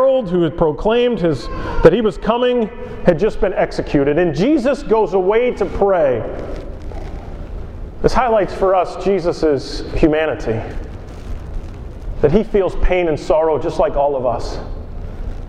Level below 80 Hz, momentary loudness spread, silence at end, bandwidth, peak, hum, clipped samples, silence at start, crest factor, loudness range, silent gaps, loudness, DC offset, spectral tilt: -28 dBFS; 17 LU; 0 s; 10 kHz; 0 dBFS; none; under 0.1%; 0 s; 16 dB; 4 LU; none; -16 LUFS; under 0.1%; -7 dB/octave